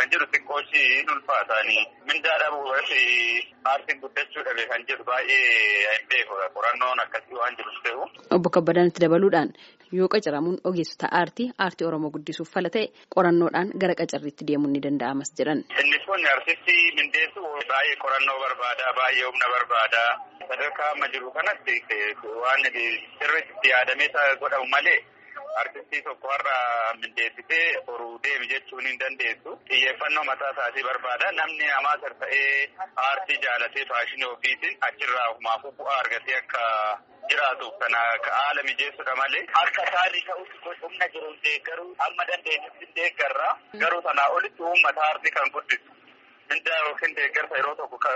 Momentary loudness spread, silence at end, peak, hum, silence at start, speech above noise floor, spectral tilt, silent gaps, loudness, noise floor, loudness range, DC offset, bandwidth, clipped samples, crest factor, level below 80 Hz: 9 LU; 0 s; -6 dBFS; none; 0 s; 30 dB; -1 dB/octave; none; -23 LUFS; -54 dBFS; 4 LU; under 0.1%; 8 kHz; under 0.1%; 20 dB; -78 dBFS